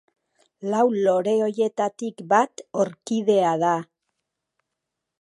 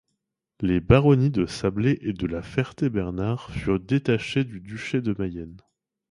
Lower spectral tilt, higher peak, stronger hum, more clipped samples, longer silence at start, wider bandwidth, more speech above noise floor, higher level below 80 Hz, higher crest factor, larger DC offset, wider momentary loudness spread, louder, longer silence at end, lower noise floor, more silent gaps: second, -5.5 dB/octave vs -7.5 dB/octave; about the same, -4 dBFS vs -2 dBFS; neither; neither; about the same, 0.6 s vs 0.6 s; about the same, 11.5 kHz vs 11 kHz; first, 61 dB vs 56 dB; second, -78 dBFS vs -42 dBFS; about the same, 20 dB vs 22 dB; neither; second, 7 LU vs 11 LU; about the same, -22 LUFS vs -24 LUFS; first, 1.4 s vs 0.5 s; about the same, -83 dBFS vs -80 dBFS; neither